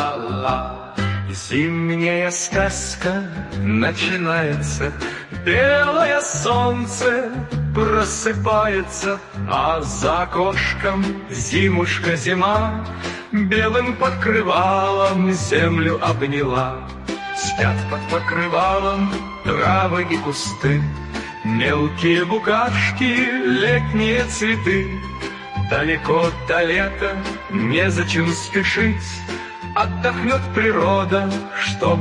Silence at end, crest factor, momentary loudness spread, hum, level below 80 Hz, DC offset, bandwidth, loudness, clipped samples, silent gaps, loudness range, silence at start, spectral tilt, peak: 0 s; 18 dB; 8 LU; none; -38 dBFS; under 0.1%; 11.5 kHz; -19 LUFS; under 0.1%; none; 2 LU; 0 s; -5 dB/octave; -2 dBFS